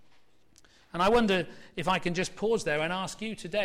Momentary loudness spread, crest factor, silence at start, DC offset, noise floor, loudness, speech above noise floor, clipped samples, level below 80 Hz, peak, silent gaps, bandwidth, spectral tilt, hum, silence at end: 12 LU; 14 dB; 0.95 s; under 0.1%; -64 dBFS; -29 LUFS; 36 dB; under 0.1%; -52 dBFS; -16 dBFS; none; 15.5 kHz; -4.5 dB/octave; none; 0 s